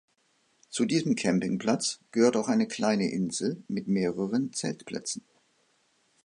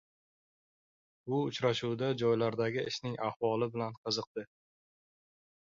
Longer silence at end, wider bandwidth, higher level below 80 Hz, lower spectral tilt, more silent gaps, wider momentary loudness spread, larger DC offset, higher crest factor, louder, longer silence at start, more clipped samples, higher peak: second, 1.05 s vs 1.35 s; first, 11 kHz vs 7.6 kHz; about the same, -70 dBFS vs -74 dBFS; about the same, -5 dB/octave vs -5.5 dB/octave; second, none vs 3.36-3.40 s, 3.97-4.04 s, 4.27-4.35 s; about the same, 10 LU vs 10 LU; neither; about the same, 20 dB vs 18 dB; first, -28 LUFS vs -34 LUFS; second, 0.7 s vs 1.25 s; neither; first, -10 dBFS vs -18 dBFS